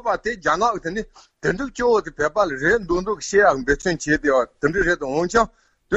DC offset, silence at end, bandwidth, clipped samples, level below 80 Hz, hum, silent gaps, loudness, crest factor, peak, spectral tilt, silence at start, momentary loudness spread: under 0.1%; 0 s; 8.2 kHz; under 0.1%; -42 dBFS; none; none; -20 LUFS; 18 dB; -2 dBFS; -4.5 dB/octave; 0.05 s; 8 LU